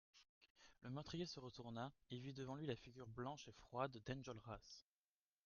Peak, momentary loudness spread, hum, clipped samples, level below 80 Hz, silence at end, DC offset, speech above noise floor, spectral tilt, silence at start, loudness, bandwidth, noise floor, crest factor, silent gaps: -30 dBFS; 9 LU; none; under 0.1%; -74 dBFS; 0.65 s; under 0.1%; over 38 dB; -5.5 dB/octave; 0.15 s; -53 LUFS; 7.2 kHz; under -90 dBFS; 22 dB; 0.29-0.41 s, 0.50-0.55 s